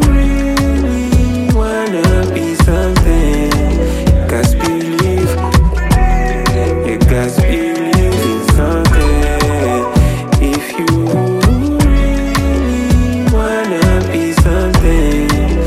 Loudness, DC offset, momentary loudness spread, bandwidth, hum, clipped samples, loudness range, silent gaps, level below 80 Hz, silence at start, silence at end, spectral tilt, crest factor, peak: -13 LUFS; under 0.1%; 3 LU; 15.5 kHz; none; under 0.1%; 0 LU; none; -14 dBFS; 0 s; 0 s; -6 dB/octave; 10 dB; 0 dBFS